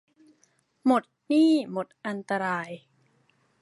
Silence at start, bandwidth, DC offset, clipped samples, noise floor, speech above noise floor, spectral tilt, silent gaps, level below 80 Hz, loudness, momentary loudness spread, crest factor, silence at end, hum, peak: 0.85 s; 11.5 kHz; under 0.1%; under 0.1%; -68 dBFS; 42 dB; -6 dB/octave; none; -82 dBFS; -26 LUFS; 14 LU; 18 dB; 0.85 s; none; -10 dBFS